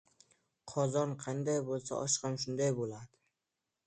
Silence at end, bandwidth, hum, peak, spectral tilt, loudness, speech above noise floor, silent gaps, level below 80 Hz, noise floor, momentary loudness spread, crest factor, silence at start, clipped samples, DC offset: 0.8 s; 9.4 kHz; none; -18 dBFS; -4.5 dB/octave; -35 LUFS; 53 dB; none; -72 dBFS; -88 dBFS; 9 LU; 18 dB; 0.65 s; under 0.1%; under 0.1%